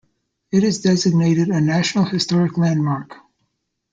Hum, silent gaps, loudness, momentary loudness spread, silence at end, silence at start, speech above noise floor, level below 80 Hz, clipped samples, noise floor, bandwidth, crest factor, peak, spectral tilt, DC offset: none; none; -18 LUFS; 5 LU; 0.8 s; 0.55 s; 55 dB; -56 dBFS; under 0.1%; -72 dBFS; 8.8 kHz; 14 dB; -4 dBFS; -6 dB/octave; under 0.1%